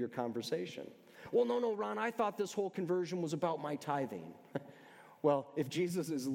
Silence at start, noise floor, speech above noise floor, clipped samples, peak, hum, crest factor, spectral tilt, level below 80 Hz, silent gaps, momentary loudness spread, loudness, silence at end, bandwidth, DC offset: 0 s; -59 dBFS; 22 dB; under 0.1%; -18 dBFS; none; 20 dB; -6 dB/octave; -86 dBFS; none; 13 LU; -37 LUFS; 0 s; 17 kHz; under 0.1%